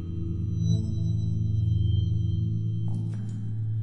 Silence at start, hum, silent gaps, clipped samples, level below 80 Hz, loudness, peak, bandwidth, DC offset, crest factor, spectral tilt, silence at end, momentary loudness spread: 0 s; none; none; under 0.1%; -48 dBFS; -28 LUFS; -14 dBFS; 6.2 kHz; under 0.1%; 12 dB; -9 dB/octave; 0 s; 7 LU